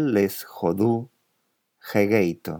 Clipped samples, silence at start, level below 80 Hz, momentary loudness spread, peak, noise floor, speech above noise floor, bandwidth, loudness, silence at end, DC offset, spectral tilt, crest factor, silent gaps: under 0.1%; 0 s; -64 dBFS; 12 LU; -6 dBFS; -73 dBFS; 50 dB; 19 kHz; -23 LUFS; 0 s; under 0.1%; -7 dB/octave; 18 dB; none